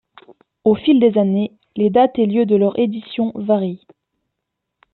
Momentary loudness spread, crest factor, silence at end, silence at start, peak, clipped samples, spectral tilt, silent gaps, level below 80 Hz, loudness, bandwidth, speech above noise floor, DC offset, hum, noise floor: 9 LU; 14 dB; 1.2 s; 0.65 s; -2 dBFS; under 0.1%; -11 dB/octave; none; -60 dBFS; -17 LUFS; 4.3 kHz; 62 dB; under 0.1%; none; -78 dBFS